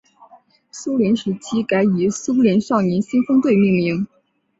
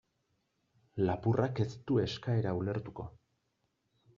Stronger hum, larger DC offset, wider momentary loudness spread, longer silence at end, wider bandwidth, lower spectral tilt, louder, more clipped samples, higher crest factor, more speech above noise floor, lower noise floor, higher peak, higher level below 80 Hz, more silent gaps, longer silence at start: neither; neither; second, 9 LU vs 15 LU; second, 0.55 s vs 1.05 s; first, 8 kHz vs 7.2 kHz; about the same, -6.5 dB/octave vs -7 dB/octave; first, -18 LUFS vs -33 LUFS; neither; second, 14 dB vs 20 dB; second, 33 dB vs 47 dB; second, -50 dBFS vs -80 dBFS; first, -4 dBFS vs -16 dBFS; first, -58 dBFS vs -64 dBFS; neither; second, 0.75 s vs 0.95 s